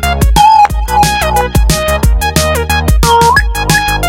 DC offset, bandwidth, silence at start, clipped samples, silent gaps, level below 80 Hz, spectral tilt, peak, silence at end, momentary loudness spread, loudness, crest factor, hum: under 0.1%; 17 kHz; 0 s; 0.6%; none; -14 dBFS; -4 dB/octave; 0 dBFS; 0 s; 5 LU; -9 LUFS; 8 dB; none